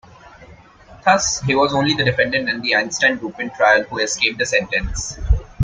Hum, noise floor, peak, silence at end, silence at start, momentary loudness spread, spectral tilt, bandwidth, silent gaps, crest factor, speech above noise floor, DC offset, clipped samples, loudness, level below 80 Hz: none; -44 dBFS; -2 dBFS; 0 s; 0.4 s; 7 LU; -3.5 dB/octave; 9.6 kHz; none; 18 dB; 26 dB; under 0.1%; under 0.1%; -18 LUFS; -30 dBFS